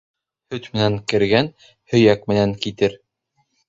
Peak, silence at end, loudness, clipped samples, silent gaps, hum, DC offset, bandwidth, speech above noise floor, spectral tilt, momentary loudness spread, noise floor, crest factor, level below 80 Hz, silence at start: 0 dBFS; 0.75 s; -19 LUFS; under 0.1%; none; none; under 0.1%; 8 kHz; 50 dB; -6.5 dB/octave; 12 LU; -69 dBFS; 20 dB; -50 dBFS; 0.5 s